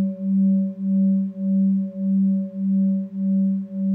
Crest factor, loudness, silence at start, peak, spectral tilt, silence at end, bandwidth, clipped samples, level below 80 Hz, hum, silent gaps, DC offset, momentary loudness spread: 8 dB; -21 LUFS; 0 s; -14 dBFS; -14 dB/octave; 0 s; 1.1 kHz; under 0.1%; -76 dBFS; none; none; under 0.1%; 4 LU